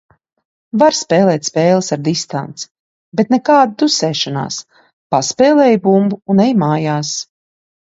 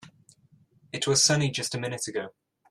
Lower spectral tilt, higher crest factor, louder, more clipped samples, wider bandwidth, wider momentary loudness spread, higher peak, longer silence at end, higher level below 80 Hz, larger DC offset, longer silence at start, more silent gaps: first, -5 dB/octave vs -3 dB/octave; second, 14 dB vs 20 dB; first, -14 LUFS vs -25 LUFS; neither; second, 8 kHz vs 15 kHz; second, 13 LU vs 16 LU; first, 0 dBFS vs -8 dBFS; first, 0.6 s vs 0.4 s; about the same, -60 dBFS vs -64 dBFS; neither; first, 0.75 s vs 0 s; first, 2.71-3.12 s, 4.93-5.10 s vs none